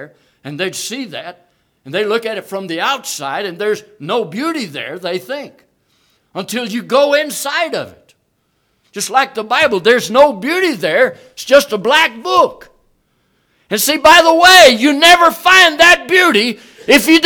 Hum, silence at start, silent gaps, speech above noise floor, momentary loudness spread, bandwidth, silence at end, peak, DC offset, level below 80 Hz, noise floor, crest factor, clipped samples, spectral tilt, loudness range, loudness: none; 0 s; none; 51 dB; 17 LU; over 20 kHz; 0 s; 0 dBFS; under 0.1%; -50 dBFS; -63 dBFS; 14 dB; 0.7%; -2 dB/octave; 13 LU; -11 LUFS